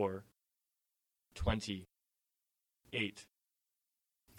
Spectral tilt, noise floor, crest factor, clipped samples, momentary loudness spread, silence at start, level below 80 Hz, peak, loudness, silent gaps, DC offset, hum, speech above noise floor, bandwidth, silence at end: -5 dB/octave; -89 dBFS; 24 dB; under 0.1%; 16 LU; 0 s; -52 dBFS; -20 dBFS; -40 LUFS; none; under 0.1%; none; 50 dB; 16.5 kHz; 0 s